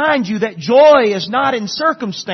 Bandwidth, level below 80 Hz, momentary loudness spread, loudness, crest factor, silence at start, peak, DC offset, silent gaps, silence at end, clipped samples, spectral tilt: 6.4 kHz; -56 dBFS; 11 LU; -13 LUFS; 14 dB; 0 s; 0 dBFS; under 0.1%; none; 0 s; under 0.1%; -4.5 dB/octave